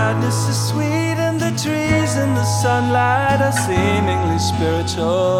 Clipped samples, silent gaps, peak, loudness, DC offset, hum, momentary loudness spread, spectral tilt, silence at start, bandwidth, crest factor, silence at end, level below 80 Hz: under 0.1%; none; -4 dBFS; -17 LUFS; under 0.1%; none; 3 LU; -5 dB/octave; 0 s; 16 kHz; 14 dB; 0 s; -42 dBFS